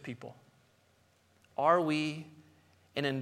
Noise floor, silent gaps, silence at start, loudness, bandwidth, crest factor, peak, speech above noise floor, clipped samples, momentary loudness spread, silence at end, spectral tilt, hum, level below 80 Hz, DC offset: -68 dBFS; none; 0.05 s; -31 LUFS; 13 kHz; 22 dB; -12 dBFS; 37 dB; under 0.1%; 21 LU; 0 s; -6 dB/octave; none; -82 dBFS; under 0.1%